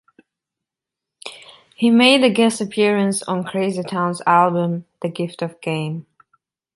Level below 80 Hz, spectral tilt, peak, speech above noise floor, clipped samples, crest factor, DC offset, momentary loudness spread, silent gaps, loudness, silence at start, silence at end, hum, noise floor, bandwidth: -68 dBFS; -5 dB/octave; -2 dBFS; 68 dB; under 0.1%; 18 dB; under 0.1%; 16 LU; none; -18 LUFS; 1.25 s; 0.75 s; none; -85 dBFS; 11.5 kHz